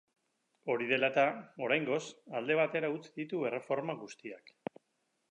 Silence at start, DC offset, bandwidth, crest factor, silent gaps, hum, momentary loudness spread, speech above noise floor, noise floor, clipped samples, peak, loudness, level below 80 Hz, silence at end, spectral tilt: 0.65 s; under 0.1%; 10 kHz; 20 dB; none; none; 17 LU; 46 dB; -80 dBFS; under 0.1%; -14 dBFS; -34 LUFS; -90 dBFS; 0.95 s; -5 dB/octave